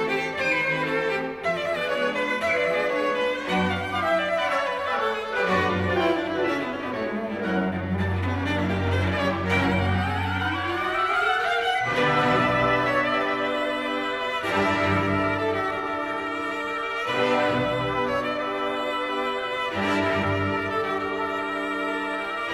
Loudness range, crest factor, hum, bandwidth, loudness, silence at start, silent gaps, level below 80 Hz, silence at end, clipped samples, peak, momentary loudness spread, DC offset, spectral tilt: 3 LU; 16 dB; none; 15 kHz; -24 LUFS; 0 s; none; -52 dBFS; 0 s; under 0.1%; -10 dBFS; 5 LU; under 0.1%; -6 dB/octave